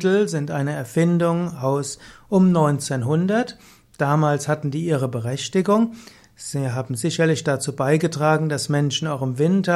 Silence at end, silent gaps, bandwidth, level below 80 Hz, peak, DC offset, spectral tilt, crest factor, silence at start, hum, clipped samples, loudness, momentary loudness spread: 0 s; none; 14 kHz; -60 dBFS; -6 dBFS; under 0.1%; -6 dB/octave; 14 dB; 0 s; none; under 0.1%; -21 LUFS; 7 LU